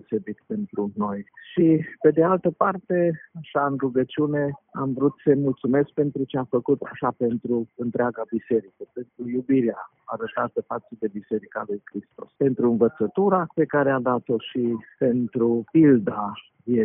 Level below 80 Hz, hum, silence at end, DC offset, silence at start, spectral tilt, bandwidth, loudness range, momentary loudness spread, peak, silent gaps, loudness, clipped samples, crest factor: -64 dBFS; none; 0 s; under 0.1%; 0.1 s; -5 dB/octave; 3.7 kHz; 5 LU; 12 LU; -4 dBFS; none; -24 LUFS; under 0.1%; 18 dB